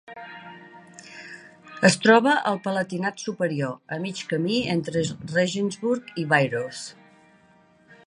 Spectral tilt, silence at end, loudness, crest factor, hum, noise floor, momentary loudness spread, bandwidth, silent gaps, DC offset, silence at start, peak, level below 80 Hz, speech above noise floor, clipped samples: -5 dB/octave; 0.1 s; -23 LUFS; 22 dB; none; -57 dBFS; 23 LU; 11.5 kHz; none; under 0.1%; 0.1 s; -4 dBFS; -64 dBFS; 34 dB; under 0.1%